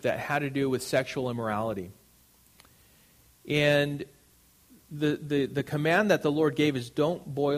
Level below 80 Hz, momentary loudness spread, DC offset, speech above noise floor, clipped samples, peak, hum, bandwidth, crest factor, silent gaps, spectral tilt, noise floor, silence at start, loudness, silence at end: -64 dBFS; 10 LU; under 0.1%; 34 dB; under 0.1%; -10 dBFS; none; 15.5 kHz; 18 dB; none; -5.5 dB/octave; -61 dBFS; 0.05 s; -28 LUFS; 0 s